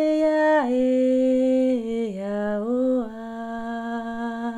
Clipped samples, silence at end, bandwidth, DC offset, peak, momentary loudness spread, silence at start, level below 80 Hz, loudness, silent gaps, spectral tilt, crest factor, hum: under 0.1%; 0 s; 10 kHz; under 0.1%; -10 dBFS; 11 LU; 0 s; -56 dBFS; -23 LUFS; none; -6.5 dB/octave; 12 dB; none